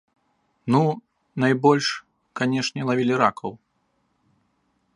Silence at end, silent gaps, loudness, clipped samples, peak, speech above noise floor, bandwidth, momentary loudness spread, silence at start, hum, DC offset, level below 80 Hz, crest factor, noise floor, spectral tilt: 1.4 s; none; -22 LUFS; under 0.1%; -2 dBFS; 49 dB; 11 kHz; 17 LU; 0.65 s; none; under 0.1%; -68 dBFS; 22 dB; -70 dBFS; -5.5 dB/octave